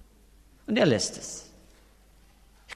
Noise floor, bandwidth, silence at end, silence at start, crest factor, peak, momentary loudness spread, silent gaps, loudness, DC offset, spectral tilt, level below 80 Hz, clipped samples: -57 dBFS; 13.5 kHz; 0 s; 0.7 s; 22 dB; -10 dBFS; 19 LU; none; -26 LUFS; under 0.1%; -4 dB/octave; -58 dBFS; under 0.1%